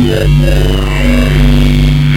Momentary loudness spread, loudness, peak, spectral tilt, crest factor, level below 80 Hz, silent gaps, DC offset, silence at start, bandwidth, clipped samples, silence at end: 3 LU; -10 LUFS; 0 dBFS; -6.5 dB/octave; 8 dB; -12 dBFS; none; under 0.1%; 0 s; 16 kHz; under 0.1%; 0 s